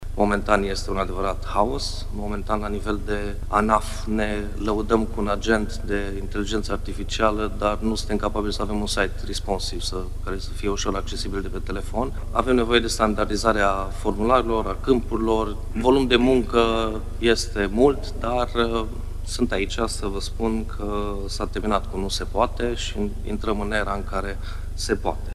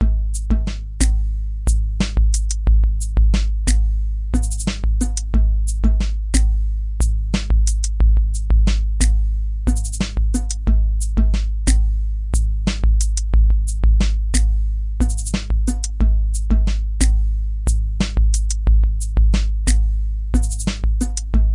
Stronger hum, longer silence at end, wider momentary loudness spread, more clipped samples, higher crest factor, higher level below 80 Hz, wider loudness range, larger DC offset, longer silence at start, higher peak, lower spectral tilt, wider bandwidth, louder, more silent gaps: first, 50 Hz at -35 dBFS vs none; about the same, 0 s vs 0 s; first, 9 LU vs 5 LU; neither; first, 20 dB vs 14 dB; second, -30 dBFS vs -16 dBFS; first, 5 LU vs 1 LU; neither; about the same, 0 s vs 0 s; about the same, -2 dBFS vs -2 dBFS; about the same, -5 dB/octave vs -5 dB/octave; first, 13 kHz vs 11.5 kHz; second, -24 LUFS vs -20 LUFS; neither